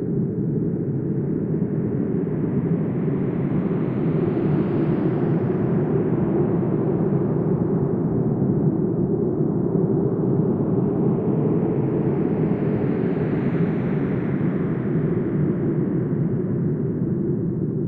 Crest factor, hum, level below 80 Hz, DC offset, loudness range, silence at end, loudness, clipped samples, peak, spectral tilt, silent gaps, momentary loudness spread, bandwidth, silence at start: 14 dB; none; -48 dBFS; under 0.1%; 2 LU; 0 s; -22 LUFS; under 0.1%; -8 dBFS; -13 dB/octave; none; 3 LU; 3.7 kHz; 0 s